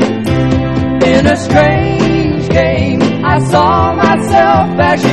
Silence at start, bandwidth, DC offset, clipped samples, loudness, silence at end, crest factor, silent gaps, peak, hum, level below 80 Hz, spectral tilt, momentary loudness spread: 0 s; 13 kHz; 1%; 0.3%; -10 LUFS; 0 s; 10 dB; none; 0 dBFS; none; -28 dBFS; -6.5 dB/octave; 4 LU